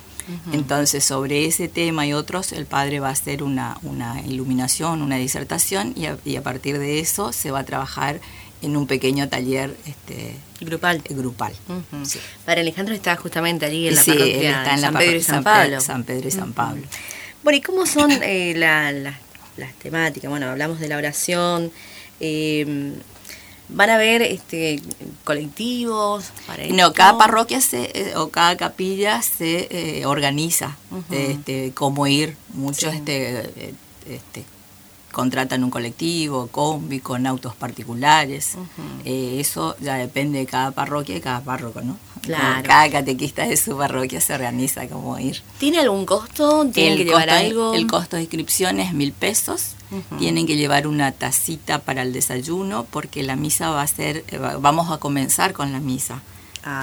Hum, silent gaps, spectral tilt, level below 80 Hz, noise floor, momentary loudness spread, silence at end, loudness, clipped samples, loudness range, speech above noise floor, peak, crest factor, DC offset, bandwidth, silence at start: none; none; -3.5 dB/octave; -52 dBFS; -46 dBFS; 16 LU; 0 s; -20 LUFS; under 0.1%; 8 LU; 26 dB; 0 dBFS; 20 dB; under 0.1%; over 20 kHz; 0 s